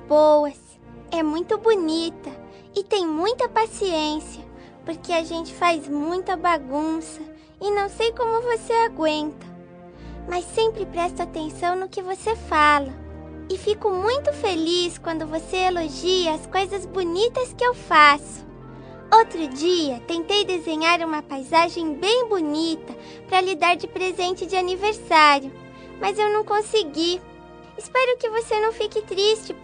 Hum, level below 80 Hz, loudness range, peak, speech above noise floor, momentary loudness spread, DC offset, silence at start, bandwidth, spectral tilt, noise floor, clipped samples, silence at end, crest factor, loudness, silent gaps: none; -50 dBFS; 5 LU; -2 dBFS; 21 dB; 19 LU; under 0.1%; 0 s; 10 kHz; -3.5 dB/octave; -43 dBFS; under 0.1%; 0 s; 22 dB; -22 LUFS; none